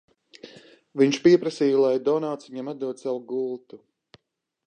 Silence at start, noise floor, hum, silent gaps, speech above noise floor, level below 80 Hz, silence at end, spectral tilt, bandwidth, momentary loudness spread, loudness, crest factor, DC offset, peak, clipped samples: 0.45 s; -79 dBFS; none; none; 56 dB; -74 dBFS; 0.9 s; -6 dB/octave; 9.4 kHz; 14 LU; -23 LUFS; 20 dB; under 0.1%; -6 dBFS; under 0.1%